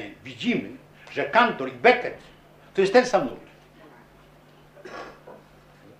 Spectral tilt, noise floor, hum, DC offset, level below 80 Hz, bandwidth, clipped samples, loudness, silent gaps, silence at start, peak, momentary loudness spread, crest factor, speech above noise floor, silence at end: -4.5 dB/octave; -53 dBFS; none; under 0.1%; -60 dBFS; 10.5 kHz; under 0.1%; -23 LUFS; none; 0 s; -2 dBFS; 23 LU; 24 dB; 30 dB; 0.65 s